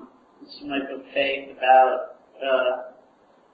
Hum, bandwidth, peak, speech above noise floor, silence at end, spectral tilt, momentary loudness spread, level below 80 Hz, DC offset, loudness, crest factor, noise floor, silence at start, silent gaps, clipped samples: none; 5 kHz; -6 dBFS; 35 dB; 0.65 s; -6 dB/octave; 19 LU; -68 dBFS; under 0.1%; -23 LUFS; 20 dB; -57 dBFS; 0 s; none; under 0.1%